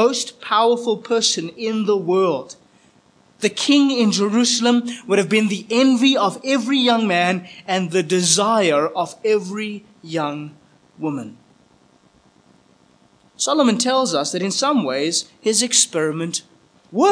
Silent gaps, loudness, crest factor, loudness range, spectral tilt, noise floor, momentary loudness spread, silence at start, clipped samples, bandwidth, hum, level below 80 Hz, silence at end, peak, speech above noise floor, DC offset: none; -18 LUFS; 18 dB; 9 LU; -3 dB/octave; -55 dBFS; 12 LU; 0 s; under 0.1%; 10.5 kHz; none; -74 dBFS; 0 s; -2 dBFS; 37 dB; under 0.1%